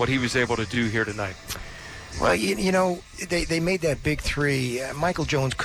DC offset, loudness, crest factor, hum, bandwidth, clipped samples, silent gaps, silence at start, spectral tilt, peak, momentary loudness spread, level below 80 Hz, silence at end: under 0.1%; -25 LUFS; 14 dB; none; 19 kHz; under 0.1%; none; 0 s; -4.5 dB/octave; -10 dBFS; 12 LU; -40 dBFS; 0 s